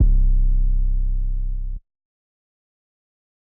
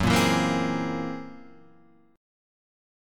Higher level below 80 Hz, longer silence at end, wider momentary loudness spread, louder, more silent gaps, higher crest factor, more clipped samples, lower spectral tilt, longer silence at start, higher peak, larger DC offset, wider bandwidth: first, -20 dBFS vs -48 dBFS; first, 1.65 s vs 0.95 s; second, 13 LU vs 17 LU; about the same, -25 LUFS vs -25 LUFS; neither; second, 10 dB vs 20 dB; neither; first, -16 dB/octave vs -5 dB/octave; about the same, 0 s vs 0 s; about the same, -8 dBFS vs -8 dBFS; neither; second, 0.5 kHz vs 17.5 kHz